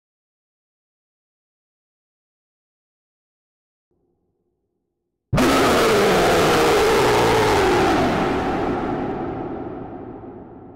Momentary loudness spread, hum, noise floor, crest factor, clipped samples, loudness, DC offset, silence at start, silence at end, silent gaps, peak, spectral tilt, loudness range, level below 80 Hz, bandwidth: 17 LU; none; -77 dBFS; 10 dB; under 0.1%; -18 LUFS; under 0.1%; 5.3 s; 0 s; none; -10 dBFS; -4.5 dB/octave; 7 LU; -40 dBFS; 16 kHz